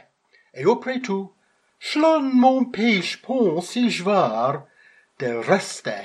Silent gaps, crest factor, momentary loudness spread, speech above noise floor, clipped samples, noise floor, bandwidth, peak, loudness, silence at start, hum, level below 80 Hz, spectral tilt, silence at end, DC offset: none; 18 dB; 12 LU; 40 dB; under 0.1%; -61 dBFS; 12 kHz; -4 dBFS; -21 LUFS; 0.55 s; none; -74 dBFS; -5 dB/octave; 0 s; under 0.1%